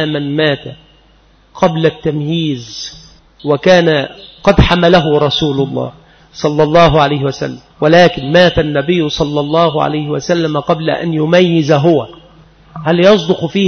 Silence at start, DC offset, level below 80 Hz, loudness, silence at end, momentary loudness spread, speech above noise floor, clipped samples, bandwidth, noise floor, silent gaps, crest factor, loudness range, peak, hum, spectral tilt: 0 s; under 0.1%; -32 dBFS; -12 LUFS; 0 s; 13 LU; 36 dB; under 0.1%; 6.6 kHz; -47 dBFS; none; 12 dB; 3 LU; 0 dBFS; none; -6 dB/octave